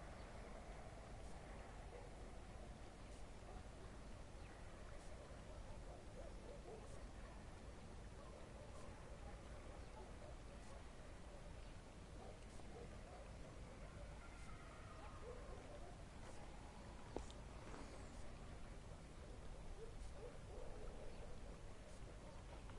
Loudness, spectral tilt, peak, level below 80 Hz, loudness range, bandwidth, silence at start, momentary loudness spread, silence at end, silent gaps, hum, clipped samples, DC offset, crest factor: -58 LUFS; -5.5 dB/octave; -32 dBFS; -58 dBFS; 1 LU; 11.5 kHz; 0 s; 2 LU; 0 s; none; none; under 0.1%; under 0.1%; 24 dB